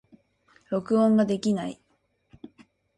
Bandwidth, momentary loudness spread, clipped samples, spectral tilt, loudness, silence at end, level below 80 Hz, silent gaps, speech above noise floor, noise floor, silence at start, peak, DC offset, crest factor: 11 kHz; 11 LU; under 0.1%; -7 dB/octave; -25 LUFS; 1.25 s; -68 dBFS; none; 47 dB; -70 dBFS; 0.7 s; -12 dBFS; under 0.1%; 16 dB